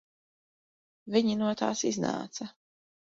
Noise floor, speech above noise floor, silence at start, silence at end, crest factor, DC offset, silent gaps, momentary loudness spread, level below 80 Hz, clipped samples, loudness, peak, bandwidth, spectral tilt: under -90 dBFS; over 61 dB; 1.05 s; 0.55 s; 20 dB; under 0.1%; none; 13 LU; -72 dBFS; under 0.1%; -30 LUFS; -12 dBFS; 7.8 kHz; -4.5 dB/octave